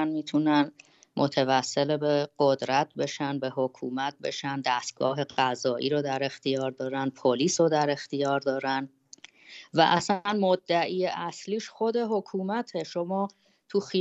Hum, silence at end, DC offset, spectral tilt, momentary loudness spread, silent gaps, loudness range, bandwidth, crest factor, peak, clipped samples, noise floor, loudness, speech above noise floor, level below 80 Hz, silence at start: none; 0 s; under 0.1%; -4.5 dB/octave; 8 LU; none; 2 LU; 8.4 kHz; 20 dB; -6 dBFS; under 0.1%; -53 dBFS; -27 LUFS; 26 dB; -76 dBFS; 0 s